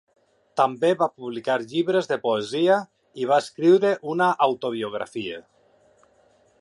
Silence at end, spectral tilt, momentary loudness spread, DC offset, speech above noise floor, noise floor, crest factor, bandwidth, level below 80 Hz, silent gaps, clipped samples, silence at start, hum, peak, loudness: 1.2 s; -5.5 dB/octave; 12 LU; under 0.1%; 38 dB; -60 dBFS; 20 dB; 11 kHz; -74 dBFS; none; under 0.1%; 0.55 s; none; -4 dBFS; -23 LUFS